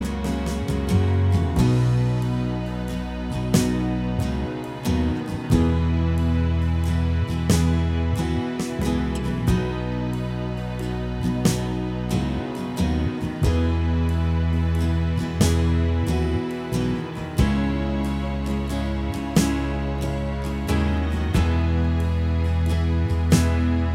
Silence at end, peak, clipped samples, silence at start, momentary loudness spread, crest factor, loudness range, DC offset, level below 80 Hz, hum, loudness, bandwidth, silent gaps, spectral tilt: 0 s; -4 dBFS; under 0.1%; 0 s; 7 LU; 18 dB; 3 LU; under 0.1%; -28 dBFS; none; -23 LUFS; 15.5 kHz; none; -6.5 dB/octave